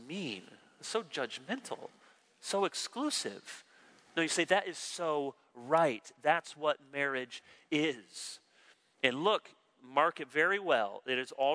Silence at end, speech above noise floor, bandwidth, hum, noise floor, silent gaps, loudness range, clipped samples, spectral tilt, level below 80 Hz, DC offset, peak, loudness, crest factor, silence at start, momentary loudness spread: 0 s; 32 dB; 11 kHz; none; -66 dBFS; none; 5 LU; under 0.1%; -3 dB/octave; under -90 dBFS; under 0.1%; -10 dBFS; -34 LUFS; 24 dB; 0 s; 16 LU